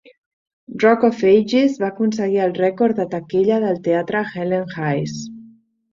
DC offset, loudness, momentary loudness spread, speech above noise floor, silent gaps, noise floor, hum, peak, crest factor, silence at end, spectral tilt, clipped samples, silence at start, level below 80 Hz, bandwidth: under 0.1%; -18 LUFS; 9 LU; 31 dB; none; -48 dBFS; none; -2 dBFS; 16 dB; 0.45 s; -6.5 dB/octave; under 0.1%; 0.7 s; -62 dBFS; 7.6 kHz